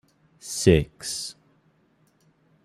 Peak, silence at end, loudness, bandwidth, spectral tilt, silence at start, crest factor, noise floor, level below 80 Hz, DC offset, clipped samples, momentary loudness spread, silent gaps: -4 dBFS; 1.35 s; -24 LUFS; 14.5 kHz; -5 dB/octave; 0.45 s; 24 dB; -64 dBFS; -44 dBFS; under 0.1%; under 0.1%; 17 LU; none